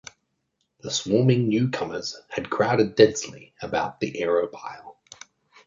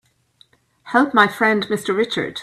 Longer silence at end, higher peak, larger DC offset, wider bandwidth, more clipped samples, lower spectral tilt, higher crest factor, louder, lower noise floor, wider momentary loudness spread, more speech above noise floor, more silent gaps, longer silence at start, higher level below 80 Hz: first, 0.75 s vs 0 s; about the same, -2 dBFS vs 0 dBFS; neither; second, 7.6 kHz vs 15 kHz; neither; about the same, -5.5 dB/octave vs -4.5 dB/octave; about the same, 22 dB vs 20 dB; second, -23 LUFS vs -18 LUFS; first, -75 dBFS vs -57 dBFS; first, 19 LU vs 6 LU; first, 52 dB vs 39 dB; neither; about the same, 0.85 s vs 0.85 s; about the same, -60 dBFS vs -62 dBFS